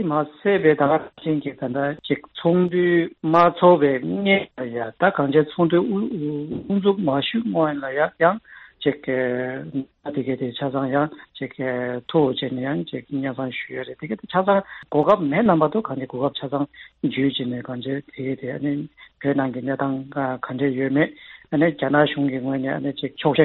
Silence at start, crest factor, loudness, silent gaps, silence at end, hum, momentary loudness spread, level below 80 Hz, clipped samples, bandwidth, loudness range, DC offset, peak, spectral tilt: 0 s; 20 dB; -22 LUFS; none; 0 s; none; 11 LU; -62 dBFS; under 0.1%; 5.4 kHz; 7 LU; under 0.1%; -2 dBFS; -5 dB/octave